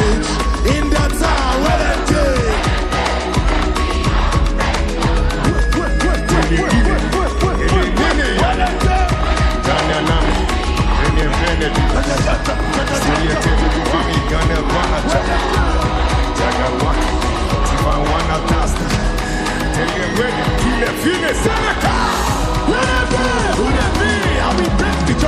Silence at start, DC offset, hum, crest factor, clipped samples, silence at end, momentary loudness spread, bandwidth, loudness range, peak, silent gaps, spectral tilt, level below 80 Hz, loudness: 0 s; under 0.1%; none; 14 dB; under 0.1%; 0 s; 2 LU; 13.5 kHz; 1 LU; -2 dBFS; none; -5 dB/octave; -18 dBFS; -16 LUFS